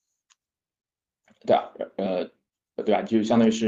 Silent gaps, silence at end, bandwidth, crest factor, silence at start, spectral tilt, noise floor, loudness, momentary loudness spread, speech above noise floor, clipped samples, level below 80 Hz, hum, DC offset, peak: none; 0 s; 7.8 kHz; 18 dB; 1.45 s; -6 dB/octave; -70 dBFS; -25 LUFS; 15 LU; 47 dB; under 0.1%; -66 dBFS; none; under 0.1%; -8 dBFS